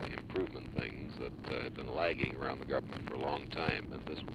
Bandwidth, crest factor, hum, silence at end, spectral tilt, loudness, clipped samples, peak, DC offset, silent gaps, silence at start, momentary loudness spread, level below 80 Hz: 12.5 kHz; 22 dB; none; 0 s; -7 dB/octave; -39 LUFS; under 0.1%; -18 dBFS; under 0.1%; none; 0 s; 8 LU; -54 dBFS